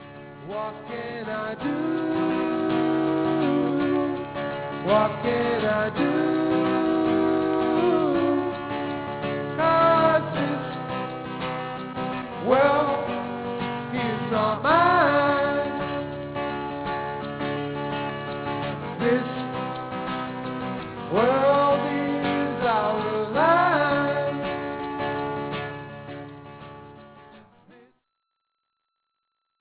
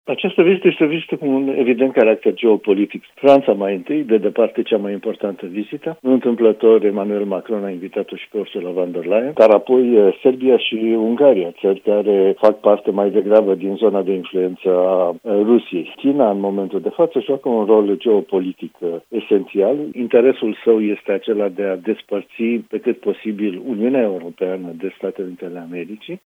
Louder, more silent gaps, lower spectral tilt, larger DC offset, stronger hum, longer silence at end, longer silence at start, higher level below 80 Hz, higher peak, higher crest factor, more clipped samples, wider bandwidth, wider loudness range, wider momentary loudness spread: second, -24 LUFS vs -17 LUFS; neither; first, -10 dB/octave vs -8 dB/octave; neither; neither; first, 2.2 s vs 0.2 s; about the same, 0 s vs 0.05 s; first, -56 dBFS vs -72 dBFS; second, -6 dBFS vs 0 dBFS; about the same, 20 dB vs 16 dB; neither; second, 4 kHz vs 5.2 kHz; about the same, 7 LU vs 6 LU; about the same, 12 LU vs 12 LU